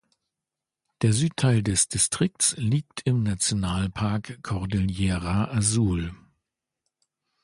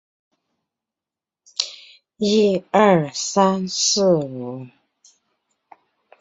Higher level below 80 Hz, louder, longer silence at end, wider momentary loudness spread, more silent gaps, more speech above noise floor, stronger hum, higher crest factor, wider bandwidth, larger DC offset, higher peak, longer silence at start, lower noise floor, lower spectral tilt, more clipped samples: first, -44 dBFS vs -64 dBFS; second, -24 LUFS vs -19 LUFS; second, 1.25 s vs 1.55 s; second, 6 LU vs 14 LU; neither; second, 63 dB vs 70 dB; neither; about the same, 18 dB vs 22 dB; first, 11.5 kHz vs 8 kHz; neither; second, -8 dBFS vs 0 dBFS; second, 1 s vs 1.6 s; about the same, -88 dBFS vs -89 dBFS; about the same, -4.5 dB/octave vs -4 dB/octave; neither